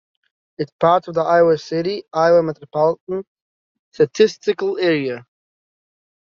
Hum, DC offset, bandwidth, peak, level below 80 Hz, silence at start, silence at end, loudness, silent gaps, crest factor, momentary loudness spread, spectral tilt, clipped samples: none; under 0.1%; 7.2 kHz; -2 dBFS; -62 dBFS; 0.6 s; 1.1 s; -18 LUFS; 0.72-0.79 s, 3.01-3.07 s, 3.27-3.36 s, 3.42-3.92 s; 18 dB; 13 LU; -4.5 dB/octave; under 0.1%